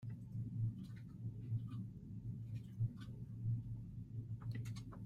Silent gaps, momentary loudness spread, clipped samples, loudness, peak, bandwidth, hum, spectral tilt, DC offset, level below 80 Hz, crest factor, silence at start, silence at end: none; 7 LU; under 0.1%; -47 LUFS; -30 dBFS; 7.6 kHz; none; -8.5 dB/octave; under 0.1%; -62 dBFS; 16 dB; 0 s; 0 s